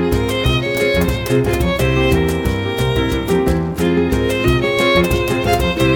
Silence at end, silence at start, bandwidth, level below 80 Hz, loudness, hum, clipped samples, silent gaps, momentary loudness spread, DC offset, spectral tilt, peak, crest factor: 0 s; 0 s; 19 kHz; -26 dBFS; -16 LUFS; none; under 0.1%; none; 4 LU; under 0.1%; -6 dB/octave; -2 dBFS; 14 dB